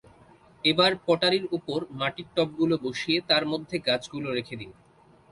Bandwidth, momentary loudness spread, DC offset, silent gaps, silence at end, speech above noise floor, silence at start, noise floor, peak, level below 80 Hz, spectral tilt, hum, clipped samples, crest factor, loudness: 11.5 kHz; 10 LU; under 0.1%; none; 0.6 s; 29 dB; 0.65 s; -55 dBFS; -8 dBFS; -64 dBFS; -5 dB/octave; none; under 0.1%; 18 dB; -26 LUFS